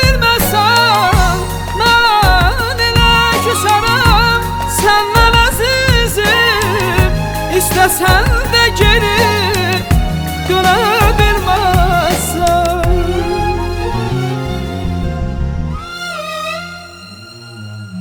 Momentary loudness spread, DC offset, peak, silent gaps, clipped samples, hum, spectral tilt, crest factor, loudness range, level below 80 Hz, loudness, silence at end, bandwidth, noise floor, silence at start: 12 LU; under 0.1%; 0 dBFS; none; under 0.1%; none; -4 dB/octave; 12 dB; 9 LU; -20 dBFS; -12 LUFS; 0 s; over 20 kHz; -33 dBFS; 0 s